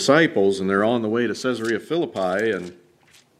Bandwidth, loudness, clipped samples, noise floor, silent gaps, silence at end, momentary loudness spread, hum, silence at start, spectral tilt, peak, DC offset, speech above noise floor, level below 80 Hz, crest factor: 14 kHz; -21 LUFS; under 0.1%; -56 dBFS; none; 0.65 s; 8 LU; none; 0 s; -5 dB/octave; -2 dBFS; under 0.1%; 35 dB; -68 dBFS; 18 dB